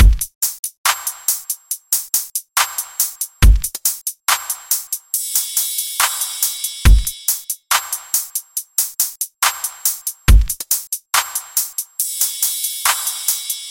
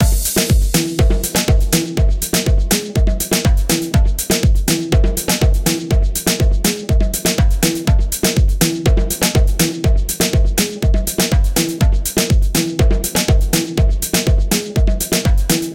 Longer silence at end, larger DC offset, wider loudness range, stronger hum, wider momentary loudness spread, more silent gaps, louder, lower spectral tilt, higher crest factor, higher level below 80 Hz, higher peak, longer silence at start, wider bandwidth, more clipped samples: about the same, 0 s vs 0 s; neither; about the same, 1 LU vs 0 LU; neither; first, 5 LU vs 2 LU; first, 0.35-0.41 s, 0.59-0.63 s, 0.78-0.84 s vs none; about the same, -18 LUFS vs -16 LUFS; second, -1.5 dB/octave vs -4.5 dB/octave; about the same, 18 dB vs 14 dB; about the same, -20 dBFS vs -16 dBFS; about the same, 0 dBFS vs 0 dBFS; about the same, 0 s vs 0 s; about the same, 17 kHz vs 17 kHz; neither